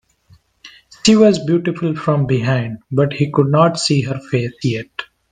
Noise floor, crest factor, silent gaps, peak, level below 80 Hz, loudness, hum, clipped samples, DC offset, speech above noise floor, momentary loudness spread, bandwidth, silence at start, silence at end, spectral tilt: -52 dBFS; 16 dB; none; 0 dBFS; -52 dBFS; -16 LUFS; none; under 0.1%; under 0.1%; 37 dB; 9 LU; 9.6 kHz; 0.65 s; 0.25 s; -6 dB/octave